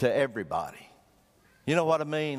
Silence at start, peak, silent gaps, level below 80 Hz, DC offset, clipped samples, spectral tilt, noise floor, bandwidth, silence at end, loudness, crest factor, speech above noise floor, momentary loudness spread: 0 s; -10 dBFS; none; -64 dBFS; under 0.1%; under 0.1%; -6 dB/octave; -63 dBFS; 15.5 kHz; 0 s; -29 LUFS; 20 dB; 35 dB; 12 LU